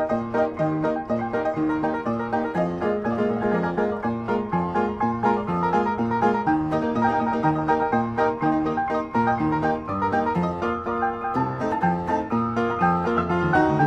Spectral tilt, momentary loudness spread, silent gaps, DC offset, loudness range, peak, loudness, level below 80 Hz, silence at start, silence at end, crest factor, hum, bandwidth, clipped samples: -8.5 dB/octave; 4 LU; none; under 0.1%; 2 LU; -6 dBFS; -23 LUFS; -48 dBFS; 0 s; 0 s; 16 dB; none; 8.4 kHz; under 0.1%